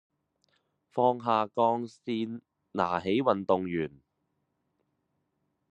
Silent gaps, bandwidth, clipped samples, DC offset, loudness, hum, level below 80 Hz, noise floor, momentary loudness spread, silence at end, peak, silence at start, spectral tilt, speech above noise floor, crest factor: none; 9 kHz; under 0.1%; under 0.1%; -29 LUFS; none; -74 dBFS; -79 dBFS; 12 LU; 1.85 s; -8 dBFS; 0.95 s; -7.5 dB/octave; 50 dB; 22 dB